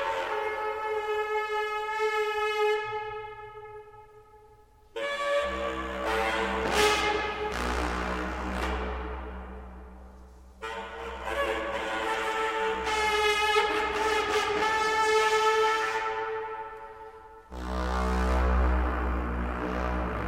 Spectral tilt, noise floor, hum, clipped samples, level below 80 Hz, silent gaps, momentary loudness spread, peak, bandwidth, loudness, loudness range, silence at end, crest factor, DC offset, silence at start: -4 dB/octave; -56 dBFS; none; under 0.1%; -38 dBFS; none; 18 LU; -10 dBFS; 16 kHz; -28 LUFS; 9 LU; 0 s; 20 dB; under 0.1%; 0 s